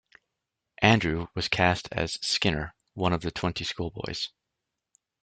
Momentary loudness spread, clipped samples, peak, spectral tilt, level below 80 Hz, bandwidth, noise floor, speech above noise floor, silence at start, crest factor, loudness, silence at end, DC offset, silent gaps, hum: 12 LU; under 0.1%; -4 dBFS; -4.5 dB/octave; -50 dBFS; 9.4 kHz; -85 dBFS; 56 dB; 0.8 s; 26 dB; -27 LUFS; 0.95 s; under 0.1%; none; none